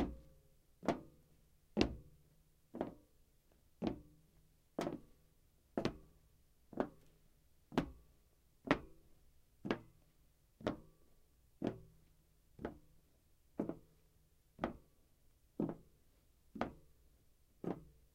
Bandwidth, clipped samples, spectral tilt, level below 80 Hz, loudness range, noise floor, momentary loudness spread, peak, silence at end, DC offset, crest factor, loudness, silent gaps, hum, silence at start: 16 kHz; under 0.1%; -6.5 dB/octave; -62 dBFS; 5 LU; -72 dBFS; 18 LU; -12 dBFS; 0.25 s; under 0.1%; 34 dB; -45 LUFS; none; none; 0 s